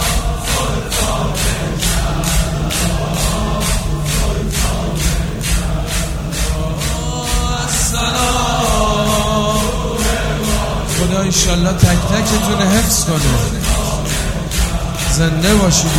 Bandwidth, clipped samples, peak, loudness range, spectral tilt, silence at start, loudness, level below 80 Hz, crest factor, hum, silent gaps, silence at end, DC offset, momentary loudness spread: 17 kHz; under 0.1%; 0 dBFS; 4 LU; -4 dB/octave; 0 s; -16 LUFS; -20 dBFS; 16 dB; none; none; 0 s; 0.5%; 6 LU